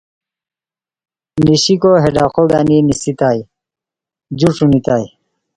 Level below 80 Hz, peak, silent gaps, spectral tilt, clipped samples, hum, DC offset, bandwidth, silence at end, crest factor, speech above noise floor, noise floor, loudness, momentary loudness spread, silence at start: -42 dBFS; 0 dBFS; none; -6 dB/octave; under 0.1%; none; under 0.1%; 11 kHz; 0.5 s; 14 dB; over 78 dB; under -90 dBFS; -13 LUFS; 9 LU; 1.35 s